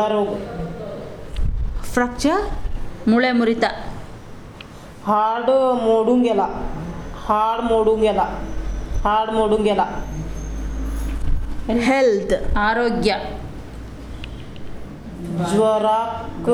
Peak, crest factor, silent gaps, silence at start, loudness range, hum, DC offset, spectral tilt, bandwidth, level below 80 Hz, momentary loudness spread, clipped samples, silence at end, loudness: -4 dBFS; 16 dB; none; 0 s; 4 LU; none; under 0.1%; -6 dB/octave; 13.5 kHz; -30 dBFS; 19 LU; under 0.1%; 0 s; -20 LUFS